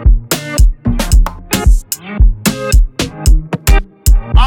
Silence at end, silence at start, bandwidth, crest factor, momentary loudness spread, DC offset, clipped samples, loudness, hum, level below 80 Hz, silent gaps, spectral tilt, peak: 0 s; 0 s; 18 kHz; 10 dB; 4 LU; under 0.1%; under 0.1%; -14 LUFS; none; -10 dBFS; none; -4.5 dB/octave; 0 dBFS